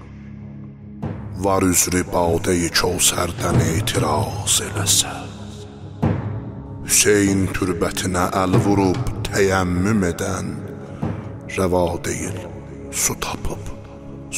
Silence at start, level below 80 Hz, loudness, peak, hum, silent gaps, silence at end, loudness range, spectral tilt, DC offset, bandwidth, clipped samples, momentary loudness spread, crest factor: 0 s; -38 dBFS; -19 LUFS; -2 dBFS; none; none; 0 s; 6 LU; -4 dB/octave; under 0.1%; 16 kHz; under 0.1%; 19 LU; 20 dB